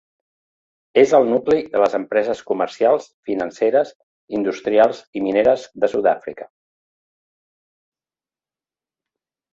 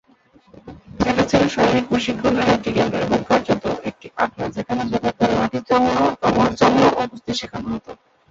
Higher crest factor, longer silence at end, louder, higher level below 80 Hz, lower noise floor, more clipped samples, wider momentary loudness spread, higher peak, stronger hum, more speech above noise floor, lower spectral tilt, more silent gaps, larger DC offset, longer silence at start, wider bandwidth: about the same, 18 dB vs 18 dB; first, 3.05 s vs 0.35 s; about the same, -19 LUFS vs -19 LUFS; second, -62 dBFS vs -44 dBFS; first, under -90 dBFS vs -54 dBFS; neither; about the same, 10 LU vs 10 LU; about the same, -2 dBFS vs -2 dBFS; neither; first, over 72 dB vs 35 dB; about the same, -5.5 dB/octave vs -5.5 dB/octave; first, 3.14-3.23 s, 3.95-4.28 s, 5.07-5.13 s vs none; neither; first, 0.95 s vs 0.65 s; about the same, 7.8 kHz vs 7.8 kHz